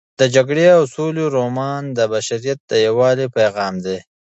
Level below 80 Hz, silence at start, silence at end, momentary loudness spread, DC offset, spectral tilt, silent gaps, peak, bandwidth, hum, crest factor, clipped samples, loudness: -60 dBFS; 0.2 s; 0.25 s; 10 LU; under 0.1%; -5 dB/octave; 2.60-2.68 s; 0 dBFS; 8.2 kHz; none; 16 dB; under 0.1%; -17 LUFS